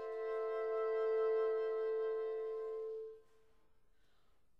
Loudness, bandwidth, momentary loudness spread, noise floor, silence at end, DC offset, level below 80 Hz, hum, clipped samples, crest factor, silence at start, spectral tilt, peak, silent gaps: -39 LUFS; 5.6 kHz; 10 LU; -77 dBFS; 1.4 s; under 0.1%; -80 dBFS; none; under 0.1%; 12 dB; 0 s; -4.5 dB/octave; -28 dBFS; none